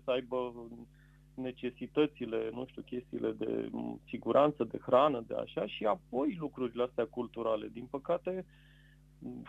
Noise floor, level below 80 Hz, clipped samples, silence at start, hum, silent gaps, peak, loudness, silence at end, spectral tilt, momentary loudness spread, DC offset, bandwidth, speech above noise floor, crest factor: -60 dBFS; -64 dBFS; under 0.1%; 0.05 s; none; none; -14 dBFS; -35 LUFS; 0 s; -8 dB/octave; 15 LU; under 0.1%; 8 kHz; 26 dB; 22 dB